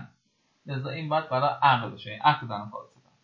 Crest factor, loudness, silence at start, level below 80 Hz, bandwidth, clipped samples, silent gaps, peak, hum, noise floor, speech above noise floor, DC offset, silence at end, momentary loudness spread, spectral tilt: 20 dB; -26 LUFS; 0 s; -70 dBFS; 6.8 kHz; under 0.1%; none; -8 dBFS; none; -71 dBFS; 44 dB; under 0.1%; 0.4 s; 14 LU; -7.5 dB/octave